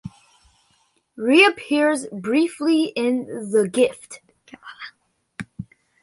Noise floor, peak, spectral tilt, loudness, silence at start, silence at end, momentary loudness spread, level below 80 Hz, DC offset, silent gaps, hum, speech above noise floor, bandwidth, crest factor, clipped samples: -64 dBFS; -2 dBFS; -4 dB/octave; -19 LUFS; 0.05 s; 0.4 s; 26 LU; -62 dBFS; under 0.1%; none; none; 44 dB; 11.5 kHz; 20 dB; under 0.1%